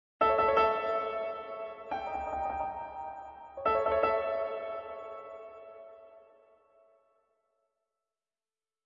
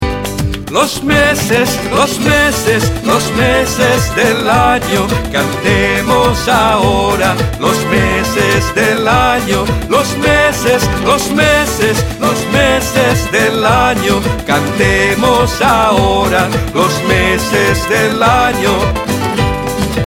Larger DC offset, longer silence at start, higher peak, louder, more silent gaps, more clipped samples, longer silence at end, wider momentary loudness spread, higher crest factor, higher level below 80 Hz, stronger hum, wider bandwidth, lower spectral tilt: neither; first, 0.2 s vs 0 s; second, -14 dBFS vs 0 dBFS; second, -32 LUFS vs -11 LUFS; neither; neither; first, 2.65 s vs 0 s; first, 20 LU vs 4 LU; first, 22 dB vs 12 dB; second, -60 dBFS vs -26 dBFS; neither; second, 7.4 kHz vs 17.5 kHz; second, -2 dB/octave vs -4.5 dB/octave